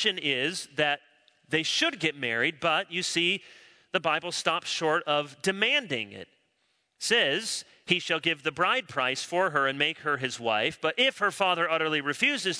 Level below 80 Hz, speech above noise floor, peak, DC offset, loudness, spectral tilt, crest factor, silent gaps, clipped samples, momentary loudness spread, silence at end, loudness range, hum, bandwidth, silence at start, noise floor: -74 dBFS; 45 dB; -6 dBFS; under 0.1%; -27 LUFS; -2.5 dB/octave; 22 dB; none; under 0.1%; 6 LU; 0 s; 2 LU; none; 11 kHz; 0 s; -73 dBFS